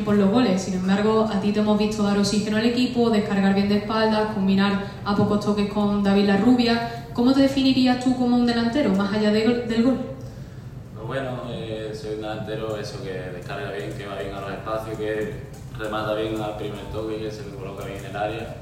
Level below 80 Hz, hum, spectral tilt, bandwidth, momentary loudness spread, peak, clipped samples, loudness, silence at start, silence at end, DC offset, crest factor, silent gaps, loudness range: -46 dBFS; none; -6.5 dB/octave; 14.5 kHz; 13 LU; -6 dBFS; under 0.1%; -23 LUFS; 0 s; 0 s; under 0.1%; 16 dB; none; 10 LU